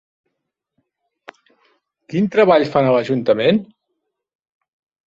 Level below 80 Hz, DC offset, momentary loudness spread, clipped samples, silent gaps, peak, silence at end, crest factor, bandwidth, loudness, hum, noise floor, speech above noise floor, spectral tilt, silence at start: -60 dBFS; under 0.1%; 8 LU; under 0.1%; none; -2 dBFS; 1.4 s; 18 dB; 7.6 kHz; -16 LUFS; none; -78 dBFS; 63 dB; -7.5 dB/octave; 2.1 s